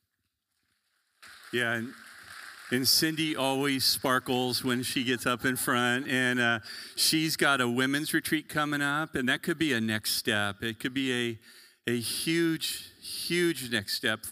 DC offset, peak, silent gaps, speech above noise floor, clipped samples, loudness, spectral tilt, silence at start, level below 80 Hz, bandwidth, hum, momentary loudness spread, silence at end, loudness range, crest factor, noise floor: under 0.1%; -10 dBFS; none; 52 dB; under 0.1%; -28 LUFS; -3 dB/octave; 1.2 s; -68 dBFS; 16 kHz; none; 10 LU; 0 s; 4 LU; 20 dB; -81 dBFS